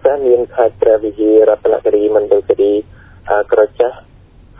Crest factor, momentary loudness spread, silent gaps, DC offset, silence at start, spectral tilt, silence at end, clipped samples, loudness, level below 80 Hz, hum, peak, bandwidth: 12 dB; 7 LU; none; under 0.1%; 0.05 s; -10 dB/octave; 0.6 s; under 0.1%; -13 LUFS; -44 dBFS; none; 0 dBFS; 3.8 kHz